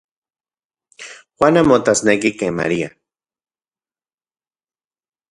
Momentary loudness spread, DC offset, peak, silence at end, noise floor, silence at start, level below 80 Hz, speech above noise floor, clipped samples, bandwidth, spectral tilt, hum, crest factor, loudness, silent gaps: 23 LU; under 0.1%; 0 dBFS; 2.45 s; under -90 dBFS; 1 s; -52 dBFS; over 75 dB; under 0.1%; 11.5 kHz; -4.5 dB/octave; none; 20 dB; -16 LUFS; none